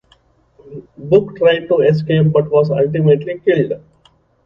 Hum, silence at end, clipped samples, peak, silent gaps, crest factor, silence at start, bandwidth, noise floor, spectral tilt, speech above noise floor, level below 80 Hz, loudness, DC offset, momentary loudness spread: none; 0.65 s; under 0.1%; 0 dBFS; none; 14 dB; 0.7 s; 5.6 kHz; -54 dBFS; -9.5 dB/octave; 40 dB; -52 dBFS; -14 LUFS; under 0.1%; 18 LU